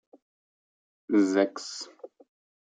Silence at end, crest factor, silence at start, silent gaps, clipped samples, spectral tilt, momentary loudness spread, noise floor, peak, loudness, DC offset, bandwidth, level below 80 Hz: 0.6 s; 20 dB; 1.1 s; none; under 0.1%; -4.5 dB/octave; 16 LU; under -90 dBFS; -10 dBFS; -27 LUFS; under 0.1%; 9.4 kHz; -84 dBFS